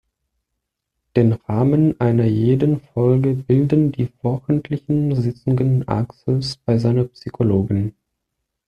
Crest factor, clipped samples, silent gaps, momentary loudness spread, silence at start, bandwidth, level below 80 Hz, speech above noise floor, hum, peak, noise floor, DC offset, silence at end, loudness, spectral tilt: 16 dB; under 0.1%; none; 6 LU; 1.15 s; 9 kHz; -50 dBFS; 61 dB; none; -2 dBFS; -79 dBFS; under 0.1%; 0.75 s; -19 LUFS; -9.5 dB/octave